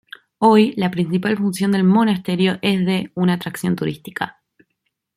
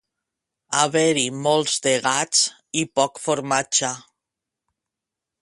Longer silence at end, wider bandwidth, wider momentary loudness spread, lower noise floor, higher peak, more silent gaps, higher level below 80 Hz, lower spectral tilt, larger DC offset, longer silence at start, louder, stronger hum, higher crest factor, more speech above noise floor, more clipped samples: second, 0.85 s vs 1.4 s; first, 15 kHz vs 11.5 kHz; first, 11 LU vs 7 LU; second, -74 dBFS vs -86 dBFS; about the same, -2 dBFS vs -4 dBFS; neither; first, -60 dBFS vs -66 dBFS; first, -6.5 dB/octave vs -2 dB/octave; neither; second, 0.4 s vs 0.7 s; about the same, -18 LUFS vs -20 LUFS; neither; about the same, 16 dB vs 20 dB; second, 56 dB vs 65 dB; neither